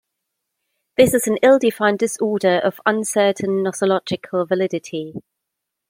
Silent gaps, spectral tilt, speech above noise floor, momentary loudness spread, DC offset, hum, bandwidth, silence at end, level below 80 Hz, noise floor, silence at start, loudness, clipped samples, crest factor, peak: none; -4.5 dB/octave; 62 dB; 12 LU; under 0.1%; none; 16.5 kHz; 0.7 s; -58 dBFS; -80 dBFS; 1 s; -18 LUFS; under 0.1%; 18 dB; -2 dBFS